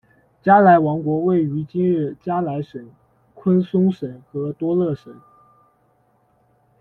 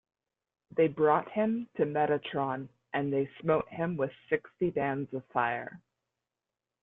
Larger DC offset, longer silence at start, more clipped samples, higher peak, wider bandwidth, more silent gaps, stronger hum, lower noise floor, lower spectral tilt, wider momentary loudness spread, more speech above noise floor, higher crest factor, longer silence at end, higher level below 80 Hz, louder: neither; second, 0.45 s vs 0.75 s; neither; first, -2 dBFS vs -12 dBFS; first, 4.3 kHz vs 3.9 kHz; neither; neither; second, -61 dBFS vs -89 dBFS; about the same, -10.5 dB/octave vs -10 dB/octave; first, 16 LU vs 9 LU; second, 43 dB vs 59 dB; about the same, 18 dB vs 20 dB; first, 1.65 s vs 1.05 s; first, -60 dBFS vs -68 dBFS; first, -19 LUFS vs -31 LUFS